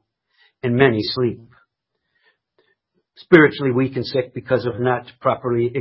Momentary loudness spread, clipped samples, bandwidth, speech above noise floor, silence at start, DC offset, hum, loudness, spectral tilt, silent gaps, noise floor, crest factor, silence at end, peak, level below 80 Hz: 11 LU; under 0.1%; 5.8 kHz; 58 dB; 0.65 s; under 0.1%; none; -19 LUFS; -9.5 dB/octave; none; -76 dBFS; 20 dB; 0 s; 0 dBFS; -54 dBFS